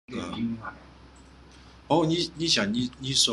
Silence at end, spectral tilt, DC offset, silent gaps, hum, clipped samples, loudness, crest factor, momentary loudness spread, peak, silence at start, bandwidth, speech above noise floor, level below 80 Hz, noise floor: 0 s; -3.5 dB/octave; under 0.1%; none; none; under 0.1%; -26 LUFS; 20 dB; 12 LU; -8 dBFS; 0.1 s; 12.5 kHz; 25 dB; -54 dBFS; -51 dBFS